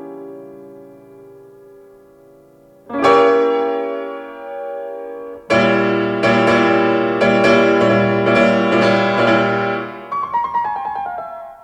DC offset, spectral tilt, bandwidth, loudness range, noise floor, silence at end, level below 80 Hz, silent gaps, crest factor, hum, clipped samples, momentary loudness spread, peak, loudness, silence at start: under 0.1%; -6 dB/octave; 10.5 kHz; 5 LU; -47 dBFS; 0.1 s; -54 dBFS; none; 16 dB; none; under 0.1%; 17 LU; 0 dBFS; -15 LUFS; 0 s